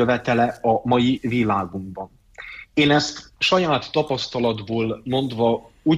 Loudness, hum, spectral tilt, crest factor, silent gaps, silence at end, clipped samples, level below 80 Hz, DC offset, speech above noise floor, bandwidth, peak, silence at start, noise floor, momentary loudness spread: -21 LUFS; none; -5.5 dB/octave; 16 dB; none; 0 s; under 0.1%; -52 dBFS; under 0.1%; 19 dB; 11 kHz; -6 dBFS; 0 s; -40 dBFS; 16 LU